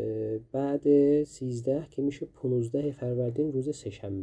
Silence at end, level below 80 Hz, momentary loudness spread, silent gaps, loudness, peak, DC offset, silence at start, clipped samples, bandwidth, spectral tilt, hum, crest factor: 0 s; -62 dBFS; 11 LU; none; -29 LUFS; -12 dBFS; under 0.1%; 0 s; under 0.1%; 10 kHz; -8.5 dB/octave; none; 16 dB